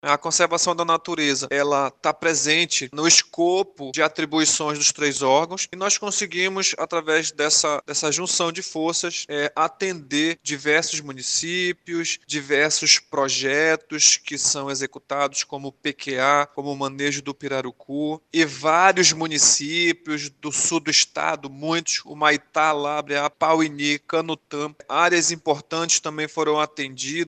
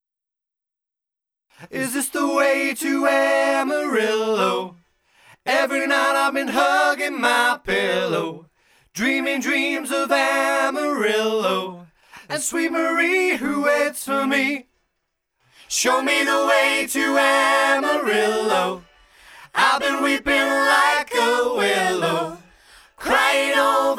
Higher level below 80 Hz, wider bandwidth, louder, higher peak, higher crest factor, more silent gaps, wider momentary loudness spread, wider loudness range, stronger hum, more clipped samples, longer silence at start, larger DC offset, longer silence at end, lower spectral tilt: second, -70 dBFS vs -58 dBFS; second, 9.6 kHz vs 17.5 kHz; about the same, -21 LUFS vs -19 LUFS; first, 0 dBFS vs -4 dBFS; about the same, 22 dB vs 18 dB; neither; first, 11 LU vs 8 LU; about the same, 4 LU vs 3 LU; neither; neither; second, 0.05 s vs 1.6 s; neither; about the same, 0 s vs 0 s; about the same, -1.5 dB/octave vs -2.5 dB/octave